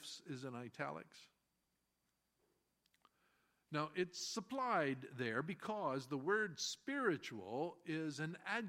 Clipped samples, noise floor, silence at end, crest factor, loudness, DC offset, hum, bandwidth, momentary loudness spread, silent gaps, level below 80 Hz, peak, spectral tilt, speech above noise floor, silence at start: under 0.1%; -86 dBFS; 0 s; 22 dB; -43 LUFS; under 0.1%; none; 16 kHz; 10 LU; none; -88 dBFS; -24 dBFS; -4 dB/octave; 43 dB; 0 s